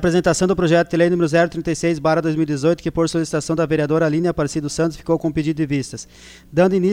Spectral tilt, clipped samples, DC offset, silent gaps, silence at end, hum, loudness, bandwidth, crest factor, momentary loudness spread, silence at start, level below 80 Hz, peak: -6 dB/octave; under 0.1%; under 0.1%; none; 0 s; none; -19 LUFS; 13.5 kHz; 14 dB; 6 LU; 0 s; -44 dBFS; -4 dBFS